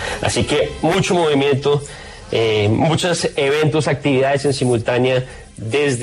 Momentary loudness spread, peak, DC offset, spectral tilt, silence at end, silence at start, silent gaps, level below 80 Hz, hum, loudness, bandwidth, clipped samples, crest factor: 6 LU; -4 dBFS; under 0.1%; -5 dB/octave; 0 s; 0 s; none; -42 dBFS; none; -17 LUFS; 13.5 kHz; under 0.1%; 12 dB